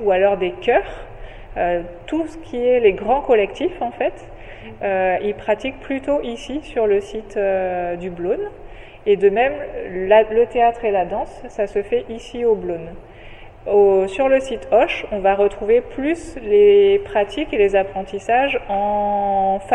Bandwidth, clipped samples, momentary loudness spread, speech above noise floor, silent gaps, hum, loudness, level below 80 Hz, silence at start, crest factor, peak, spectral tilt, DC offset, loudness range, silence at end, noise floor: 9.6 kHz; under 0.1%; 12 LU; 20 dB; none; none; -19 LUFS; -40 dBFS; 0 s; 16 dB; -2 dBFS; -6 dB/octave; under 0.1%; 5 LU; 0 s; -38 dBFS